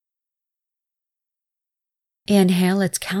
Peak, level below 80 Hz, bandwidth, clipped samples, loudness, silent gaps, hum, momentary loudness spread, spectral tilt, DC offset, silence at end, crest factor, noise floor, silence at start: -4 dBFS; -62 dBFS; 16 kHz; under 0.1%; -19 LUFS; none; none; 7 LU; -5.5 dB/octave; under 0.1%; 0 s; 20 dB; -87 dBFS; 2.3 s